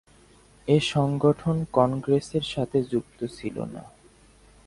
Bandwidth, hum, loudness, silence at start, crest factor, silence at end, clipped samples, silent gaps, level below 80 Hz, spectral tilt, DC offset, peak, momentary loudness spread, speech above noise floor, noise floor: 11.5 kHz; none; -25 LUFS; 0.65 s; 22 dB; 0.8 s; under 0.1%; none; -54 dBFS; -6.5 dB/octave; under 0.1%; -6 dBFS; 13 LU; 31 dB; -55 dBFS